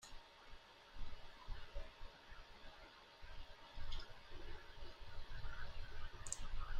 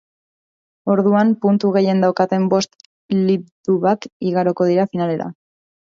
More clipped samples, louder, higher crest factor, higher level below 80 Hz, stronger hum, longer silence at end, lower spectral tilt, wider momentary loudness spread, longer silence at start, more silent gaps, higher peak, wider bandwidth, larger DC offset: neither; second, -56 LUFS vs -18 LUFS; first, 22 dB vs 16 dB; first, -52 dBFS vs -64 dBFS; neither; second, 0 s vs 0.6 s; second, -2.5 dB/octave vs -7 dB/octave; first, 11 LU vs 7 LU; second, 0 s vs 0.85 s; second, none vs 2.86-3.09 s, 3.52-3.64 s, 4.12-4.20 s; second, -24 dBFS vs -2 dBFS; first, 9.8 kHz vs 7.6 kHz; neither